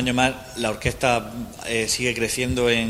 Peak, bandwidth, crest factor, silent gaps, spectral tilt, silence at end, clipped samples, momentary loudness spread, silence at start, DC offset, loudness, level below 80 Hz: -2 dBFS; 16 kHz; 20 dB; none; -3.5 dB/octave; 0 s; under 0.1%; 6 LU; 0 s; under 0.1%; -23 LUFS; -42 dBFS